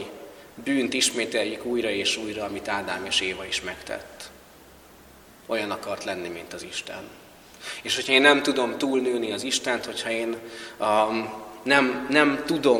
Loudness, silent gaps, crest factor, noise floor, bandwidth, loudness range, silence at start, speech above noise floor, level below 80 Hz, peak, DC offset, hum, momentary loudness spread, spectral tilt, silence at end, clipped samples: -24 LUFS; none; 26 dB; -50 dBFS; 19 kHz; 10 LU; 0 s; 25 dB; -60 dBFS; 0 dBFS; under 0.1%; none; 16 LU; -2.5 dB/octave; 0 s; under 0.1%